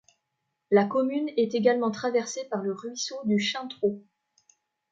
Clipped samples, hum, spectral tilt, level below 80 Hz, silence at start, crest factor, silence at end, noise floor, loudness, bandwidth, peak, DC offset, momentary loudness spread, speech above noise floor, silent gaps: under 0.1%; none; -4.5 dB/octave; -74 dBFS; 0.7 s; 20 dB; 0.9 s; -81 dBFS; -27 LUFS; 7.8 kHz; -8 dBFS; under 0.1%; 9 LU; 54 dB; none